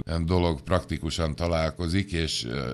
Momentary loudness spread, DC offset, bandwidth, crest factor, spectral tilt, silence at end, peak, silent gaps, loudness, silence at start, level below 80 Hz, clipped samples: 4 LU; under 0.1%; 12 kHz; 18 dB; -5.5 dB/octave; 0 s; -8 dBFS; none; -27 LUFS; 0.05 s; -38 dBFS; under 0.1%